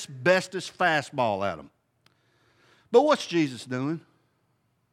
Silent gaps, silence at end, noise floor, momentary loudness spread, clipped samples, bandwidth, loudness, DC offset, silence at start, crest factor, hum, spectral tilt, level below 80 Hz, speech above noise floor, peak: none; 0.95 s; -71 dBFS; 11 LU; under 0.1%; 14 kHz; -25 LUFS; under 0.1%; 0 s; 20 dB; none; -5 dB/octave; -74 dBFS; 46 dB; -6 dBFS